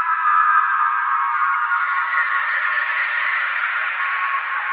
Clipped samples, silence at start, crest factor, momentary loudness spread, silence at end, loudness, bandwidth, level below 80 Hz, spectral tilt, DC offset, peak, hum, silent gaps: under 0.1%; 0 s; 14 dB; 5 LU; 0 s; -18 LUFS; 5 kHz; -84 dBFS; 7 dB/octave; under 0.1%; -6 dBFS; none; none